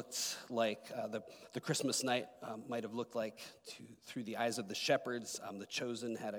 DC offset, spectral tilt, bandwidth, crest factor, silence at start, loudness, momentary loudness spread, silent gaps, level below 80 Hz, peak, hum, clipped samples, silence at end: under 0.1%; -3 dB/octave; 19.5 kHz; 20 dB; 0 s; -39 LUFS; 13 LU; none; -88 dBFS; -20 dBFS; none; under 0.1%; 0 s